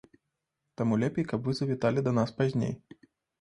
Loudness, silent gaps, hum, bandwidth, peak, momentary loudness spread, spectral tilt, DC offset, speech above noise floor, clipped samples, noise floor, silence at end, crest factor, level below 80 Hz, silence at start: -29 LUFS; none; none; 10.5 kHz; -12 dBFS; 5 LU; -7.5 dB/octave; under 0.1%; 55 dB; under 0.1%; -83 dBFS; 0.65 s; 18 dB; -62 dBFS; 0.8 s